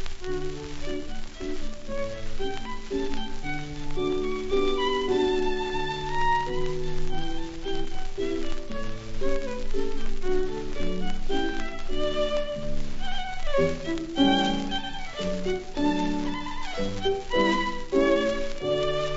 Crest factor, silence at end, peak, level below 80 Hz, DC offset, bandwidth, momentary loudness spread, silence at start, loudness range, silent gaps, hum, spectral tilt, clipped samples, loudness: 16 dB; 0 s; -10 dBFS; -32 dBFS; under 0.1%; 7.8 kHz; 11 LU; 0 s; 7 LU; none; none; -5 dB/octave; under 0.1%; -29 LUFS